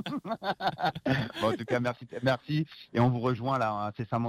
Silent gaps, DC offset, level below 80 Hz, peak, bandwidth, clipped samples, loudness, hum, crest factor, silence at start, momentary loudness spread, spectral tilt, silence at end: none; under 0.1%; -60 dBFS; -14 dBFS; 14 kHz; under 0.1%; -30 LUFS; none; 16 dB; 0 s; 7 LU; -7 dB/octave; 0 s